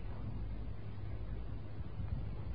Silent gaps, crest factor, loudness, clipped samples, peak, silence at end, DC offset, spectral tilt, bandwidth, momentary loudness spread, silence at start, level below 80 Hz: none; 14 dB; -45 LUFS; under 0.1%; -28 dBFS; 0 s; 0.6%; -8 dB/octave; 5 kHz; 4 LU; 0 s; -46 dBFS